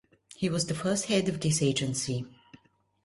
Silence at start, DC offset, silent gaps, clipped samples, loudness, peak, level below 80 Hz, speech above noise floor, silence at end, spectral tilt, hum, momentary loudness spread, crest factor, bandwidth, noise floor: 0.4 s; under 0.1%; none; under 0.1%; -29 LUFS; -14 dBFS; -60 dBFS; 31 dB; 0.5 s; -4.5 dB/octave; none; 7 LU; 16 dB; 11.5 kHz; -59 dBFS